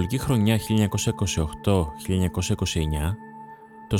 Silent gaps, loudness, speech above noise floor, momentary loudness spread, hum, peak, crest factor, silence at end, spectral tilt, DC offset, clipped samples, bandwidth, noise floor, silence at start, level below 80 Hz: none; -24 LUFS; 20 dB; 17 LU; none; -6 dBFS; 18 dB; 0 s; -5.5 dB/octave; under 0.1%; under 0.1%; 17.5 kHz; -44 dBFS; 0 s; -38 dBFS